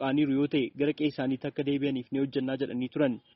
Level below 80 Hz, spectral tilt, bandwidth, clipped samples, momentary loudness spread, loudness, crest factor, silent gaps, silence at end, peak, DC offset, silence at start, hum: -68 dBFS; -5.5 dB/octave; 5.8 kHz; under 0.1%; 5 LU; -30 LUFS; 14 dB; none; 0.15 s; -14 dBFS; under 0.1%; 0 s; none